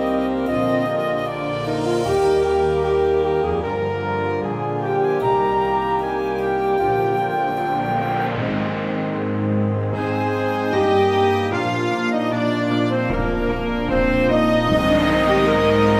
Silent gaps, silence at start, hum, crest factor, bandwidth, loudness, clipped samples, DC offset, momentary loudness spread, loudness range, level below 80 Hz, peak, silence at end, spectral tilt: none; 0 s; none; 14 dB; 14.5 kHz; -20 LUFS; under 0.1%; under 0.1%; 6 LU; 2 LU; -36 dBFS; -6 dBFS; 0 s; -7 dB/octave